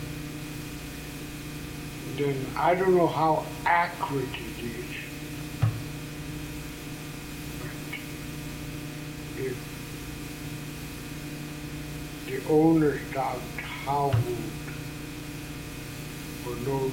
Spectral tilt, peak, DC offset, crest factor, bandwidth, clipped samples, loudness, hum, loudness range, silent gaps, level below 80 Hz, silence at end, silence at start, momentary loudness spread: -6 dB/octave; -10 dBFS; under 0.1%; 20 dB; 17 kHz; under 0.1%; -30 LUFS; 60 Hz at -50 dBFS; 10 LU; none; -48 dBFS; 0 s; 0 s; 14 LU